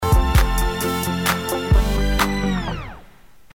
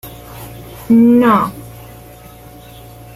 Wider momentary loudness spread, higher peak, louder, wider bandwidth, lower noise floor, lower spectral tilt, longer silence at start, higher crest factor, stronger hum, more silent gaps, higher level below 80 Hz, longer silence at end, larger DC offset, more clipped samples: second, 8 LU vs 25 LU; about the same, -4 dBFS vs -2 dBFS; second, -20 LUFS vs -11 LUFS; first, 18 kHz vs 15.5 kHz; first, -48 dBFS vs -37 dBFS; second, -5 dB/octave vs -7 dB/octave; about the same, 0 s vs 0.05 s; about the same, 16 dB vs 14 dB; neither; neither; first, -22 dBFS vs -44 dBFS; second, 0.5 s vs 1.45 s; first, 0.5% vs under 0.1%; neither